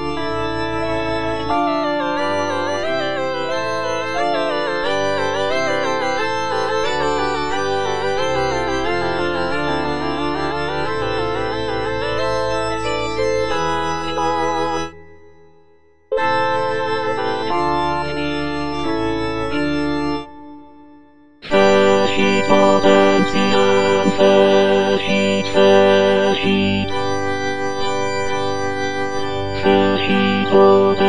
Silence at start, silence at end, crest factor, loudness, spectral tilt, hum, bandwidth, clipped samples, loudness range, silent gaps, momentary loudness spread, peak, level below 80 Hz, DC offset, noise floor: 0 s; 0 s; 18 dB; -18 LUFS; -5 dB/octave; none; 10 kHz; under 0.1%; 7 LU; none; 9 LU; 0 dBFS; -42 dBFS; 4%; -54 dBFS